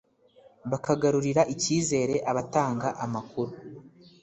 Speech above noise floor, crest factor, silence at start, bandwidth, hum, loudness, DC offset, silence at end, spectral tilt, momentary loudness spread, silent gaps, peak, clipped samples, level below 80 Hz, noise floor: 31 dB; 20 dB; 0.65 s; 8.4 kHz; none; -27 LUFS; under 0.1%; 0.35 s; -5 dB/octave; 11 LU; none; -8 dBFS; under 0.1%; -62 dBFS; -58 dBFS